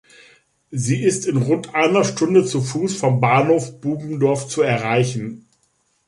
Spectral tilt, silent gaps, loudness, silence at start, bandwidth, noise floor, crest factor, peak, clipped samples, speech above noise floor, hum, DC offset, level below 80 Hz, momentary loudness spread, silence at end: -5.5 dB/octave; none; -19 LUFS; 0.7 s; 11.5 kHz; -65 dBFS; 16 dB; -2 dBFS; under 0.1%; 47 dB; none; under 0.1%; -60 dBFS; 10 LU; 0.7 s